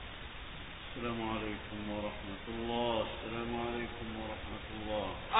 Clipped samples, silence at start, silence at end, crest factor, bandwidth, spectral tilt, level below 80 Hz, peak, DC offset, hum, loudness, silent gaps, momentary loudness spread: under 0.1%; 0 s; 0 s; 24 dB; 3.9 kHz; -2.5 dB/octave; -52 dBFS; -14 dBFS; under 0.1%; none; -39 LUFS; none; 11 LU